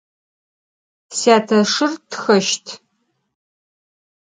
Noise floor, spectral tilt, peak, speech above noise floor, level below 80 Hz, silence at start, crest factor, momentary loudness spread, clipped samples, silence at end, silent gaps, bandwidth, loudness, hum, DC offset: -69 dBFS; -3.5 dB/octave; 0 dBFS; 53 dB; -70 dBFS; 1.1 s; 20 dB; 14 LU; under 0.1%; 1.45 s; none; 9.6 kHz; -17 LUFS; none; under 0.1%